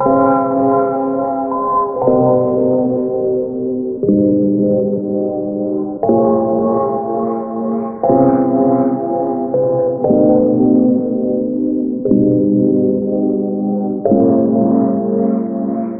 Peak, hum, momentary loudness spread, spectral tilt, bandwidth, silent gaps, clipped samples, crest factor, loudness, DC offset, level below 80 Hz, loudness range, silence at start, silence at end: 0 dBFS; none; 7 LU; -14.5 dB/octave; 2.3 kHz; none; under 0.1%; 14 dB; -15 LUFS; under 0.1%; -50 dBFS; 2 LU; 0 s; 0 s